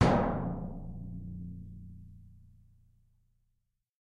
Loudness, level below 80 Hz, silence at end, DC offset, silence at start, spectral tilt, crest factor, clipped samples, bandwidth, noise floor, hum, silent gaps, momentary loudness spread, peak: -36 LUFS; -48 dBFS; 1.5 s; under 0.1%; 0 s; -7.5 dB/octave; 26 dB; under 0.1%; 10.5 kHz; -79 dBFS; none; none; 23 LU; -10 dBFS